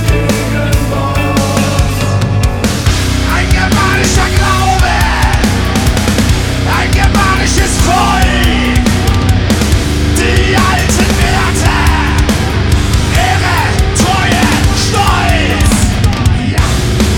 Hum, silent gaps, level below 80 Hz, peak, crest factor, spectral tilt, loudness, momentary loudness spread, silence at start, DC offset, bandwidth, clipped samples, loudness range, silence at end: none; none; -16 dBFS; 0 dBFS; 10 dB; -4.5 dB/octave; -10 LUFS; 3 LU; 0 s; under 0.1%; 18.5 kHz; under 0.1%; 1 LU; 0 s